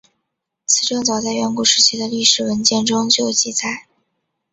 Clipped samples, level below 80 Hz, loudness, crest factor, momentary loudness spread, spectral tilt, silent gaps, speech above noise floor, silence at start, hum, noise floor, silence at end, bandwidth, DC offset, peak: under 0.1%; -60 dBFS; -15 LUFS; 18 dB; 9 LU; -1.5 dB/octave; none; 59 dB; 0.7 s; none; -76 dBFS; 0.7 s; 8.4 kHz; under 0.1%; 0 dBFS